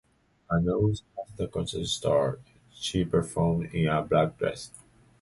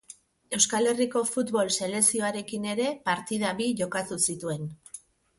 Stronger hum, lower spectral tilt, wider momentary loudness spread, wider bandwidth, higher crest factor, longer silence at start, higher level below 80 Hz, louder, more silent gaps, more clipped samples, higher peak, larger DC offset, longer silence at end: neither; first, -6 dB/octave vs -3 dB/octave; about the same, 11 LU vs 12 LU; about the same, 11.5 kHz vs 12 kHz; about the same, 18 dB vs 22 dB; first, 0.5 s vs 0.1 s; first, -48 dBFS vs -66 dBFS; about the same, -28 LUFS vs -26 LUFS; neither; neither; second, -10 dBFS vs -6 dBFS; neither; about the same, 0.45 s vs 0.4 s